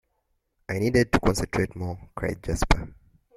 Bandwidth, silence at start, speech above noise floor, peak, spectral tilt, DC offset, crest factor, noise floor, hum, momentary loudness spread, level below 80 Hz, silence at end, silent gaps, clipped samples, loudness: 15.5 kHz; 0.7 s; 49 dB; -2 dBFS; -5.5 dB/octave; under 0.1%; 24 dB; -74 dBFS; none; 13 LU; -34 dBFS; 0.45 s; none; under 0.1%; -26 LUFS